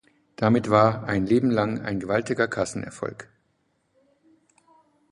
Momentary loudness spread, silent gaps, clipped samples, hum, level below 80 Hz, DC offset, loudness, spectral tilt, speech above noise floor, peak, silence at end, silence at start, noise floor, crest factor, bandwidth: 14 LU; none; under 0.1%; none; -56 dBFS; under 0.1%; -24 LUFS; -6.5 dB/octave; 47 dB; -2 dBFS; 1.85 s; 0.4 s; -70 dBFS; 22 dB; 11.5 kHz